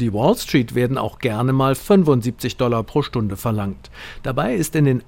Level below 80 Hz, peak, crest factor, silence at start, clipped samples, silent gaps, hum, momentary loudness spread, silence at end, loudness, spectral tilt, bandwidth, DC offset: -42 dBFS; -2 dBFS; 16 dB; 0 s; under 0.1%; none; none; 9 LU; 0.05 s; -19 LUFS; -6.5 dB/octave; 17 kHz; under 0.1%